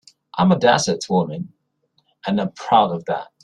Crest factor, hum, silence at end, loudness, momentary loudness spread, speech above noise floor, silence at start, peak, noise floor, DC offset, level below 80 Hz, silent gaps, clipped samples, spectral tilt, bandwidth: 18 dB; none; 0.2 s; -19 LUFS; 16 LU; 48 dB; 0.35 s; -2 dBFS; -67 dBFS; under 0.1%; -58 dBFS; none; under 0.1%; -5 dB/octave; 10.5 kHz